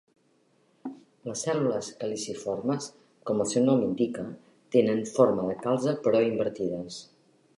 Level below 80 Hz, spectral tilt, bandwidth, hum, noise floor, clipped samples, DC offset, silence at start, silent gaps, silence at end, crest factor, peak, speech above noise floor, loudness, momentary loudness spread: -68 dBFS; -5.5 dB/octave; 11.5 kHz; none; -67 dBFS; under 0.1%; under 0.1%; 0.85 s; none; 0.55 s; 20 dB; -8 dBFS; 40 dB; -27 LUFS; 18 LU